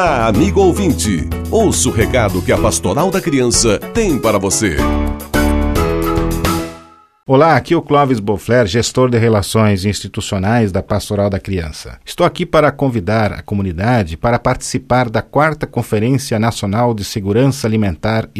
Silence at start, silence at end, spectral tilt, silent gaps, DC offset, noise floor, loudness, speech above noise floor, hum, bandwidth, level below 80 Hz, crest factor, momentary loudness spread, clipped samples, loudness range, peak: 0 s; 0 s; -5 dB/octave; none; under 0.1%; -40 dBFS; -14 LUFS; 26 dB; none; 14 kHz; -28 dBFS; 14 dB; 7 LU; under 0.1%; 3 LU; 0 dBFS